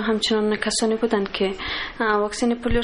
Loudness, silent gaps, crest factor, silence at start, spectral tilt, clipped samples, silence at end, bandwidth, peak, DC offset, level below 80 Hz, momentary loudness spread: -22 LUFS; none; 12 dB; 0 s; -3.5 dB/octave; under 0.1%; 0 s; 11.5 kHz; -10 dBFS; under 0.1%; -36 dBFS; 4 LU